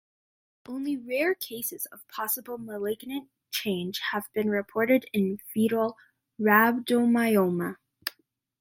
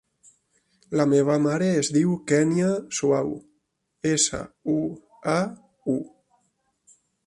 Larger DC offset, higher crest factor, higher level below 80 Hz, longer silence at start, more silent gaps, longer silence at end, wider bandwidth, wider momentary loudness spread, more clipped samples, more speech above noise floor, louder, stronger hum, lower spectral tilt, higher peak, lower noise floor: neither; first, 24 dB vs 18 dB; second, -74 dBFS vs -60 dBFS; second, 0.7 s vs 0.9 s; neither; second, 0.5 s vs 1.2 s; first, 16.5 kHz vs 11.5 kHz; about the same, 14 LU vs 12 LU; neither; second, 40 dB vs 50 dB; second, -27 LUFS vs -24 LUFS; neither; about the same, -5 dB/octave vs -5 dB/octave; about the same, -4 dBFS vs -6 dBFS; second, -67 dBFS vs -73 dBFS